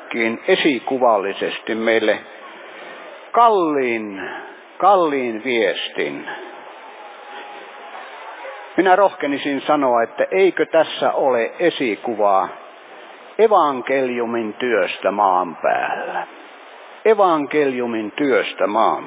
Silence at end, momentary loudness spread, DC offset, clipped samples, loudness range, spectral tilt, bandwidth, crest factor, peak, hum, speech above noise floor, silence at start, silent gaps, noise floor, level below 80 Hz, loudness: 0 s; 21 LU; under 0.1%; under 0.1%; 4 LU; -8.5 dB/octave; 4 kHz; 18 dB; -2 dBFS; none; 22 dB; 0 s; none; -40 dBFS; -76 dBFS; -18 LUFS